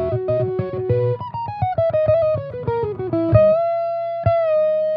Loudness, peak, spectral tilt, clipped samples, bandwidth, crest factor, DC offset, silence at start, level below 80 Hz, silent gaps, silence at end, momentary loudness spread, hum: -19 LUFS; 0 dBFS; -11 dB/octave; under 0.1%; 5.2 kHz; 18 dB; under 0.1%; 0 s; -44 dBFS; none; 0 s; 9 LU; 60 Hz at -40 dBFS